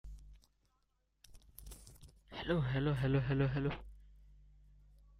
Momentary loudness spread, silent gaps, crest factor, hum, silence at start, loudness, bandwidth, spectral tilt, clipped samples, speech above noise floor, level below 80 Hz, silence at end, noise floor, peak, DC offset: 25 LU; none; 18 dB; none; 0.05 s; -36 LUFS; 15 kHz; -7.5 dB/octave; under 0.1%; 45 dB; -54 dBFS; 0.85 s; -79 dBFS; -20 dBFS; under 0.1%